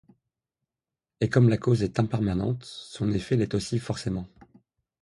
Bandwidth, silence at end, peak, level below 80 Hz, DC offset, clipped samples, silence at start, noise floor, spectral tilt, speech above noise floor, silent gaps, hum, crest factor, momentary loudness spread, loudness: 11.5 kHz; 0.8 s; -8 dBFS; -50 dBFS; under 0.1%; under 0.1%; 1.2 s; -90 dBFS; -7 dB/octave; 64 dB; none; none; 20 dB; 12 LU; -26 LUFS